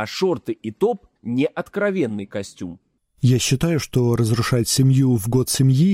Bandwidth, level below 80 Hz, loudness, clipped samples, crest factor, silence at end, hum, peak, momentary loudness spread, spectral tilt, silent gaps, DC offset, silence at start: 16 kHz; -46 dBFS; -20 LUFS; under 0.1%; 12 dB; 0 s; none; -6 dBFS; 13 LU; -5.5 dB/octave; none; under 0.1%; 0 s